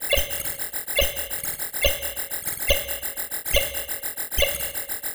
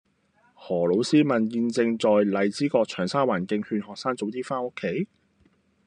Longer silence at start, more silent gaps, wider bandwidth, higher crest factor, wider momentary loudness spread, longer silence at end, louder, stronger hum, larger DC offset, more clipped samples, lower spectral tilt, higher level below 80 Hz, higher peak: second, 0 s vs 0.6 s; neither; first, over 20 kHz vs 10 kHz; about the same, 22 dB vs 18 dB; second, 5 LU vs 9 LU; second, 0 s vs 0.8 s; about the same, -24 LUFS vs -25 LUFS; neither; neither; neither; second, -1 dB/octave vs -6 dB/octave; first, -36 dBFS vs -70 dBFS; first, -4 dBFS vs -8 dBFS